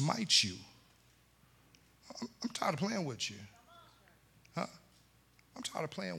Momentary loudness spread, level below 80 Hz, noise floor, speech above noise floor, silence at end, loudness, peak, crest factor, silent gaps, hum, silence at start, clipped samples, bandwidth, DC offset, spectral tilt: 24 LU; -74 dBFS; -67 dBFS; 31 dB; 0 s; -35 LUFS; -16 dBFS; 24 dB; none; none; 0 s; under 0.1%; 18 kHz; under 0.1%; -3 dB/octave